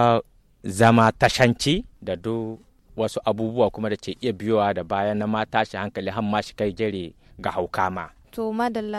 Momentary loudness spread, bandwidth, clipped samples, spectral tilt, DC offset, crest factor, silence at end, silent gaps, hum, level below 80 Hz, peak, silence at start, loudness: 14 LU; 13.5 kHz; under 0.1%; -5.5 dB/octave; under 0.1%; 20 dB; 0 s; none; none; -50 dBFS; -4 dBFS; 0 s; -23 LUFS